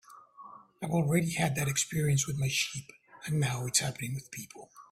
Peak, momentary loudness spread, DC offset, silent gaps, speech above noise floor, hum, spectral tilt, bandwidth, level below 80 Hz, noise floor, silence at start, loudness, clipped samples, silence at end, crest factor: -12 dBFS; 21 LU; under 0.1%; none; 21 dB; none; -4 dB/octave; 16 kHz; -62 dBFS; -52 dBFS; 0.1 s; -30 LUFS; under 0.1%; 0.05 s; 20 dB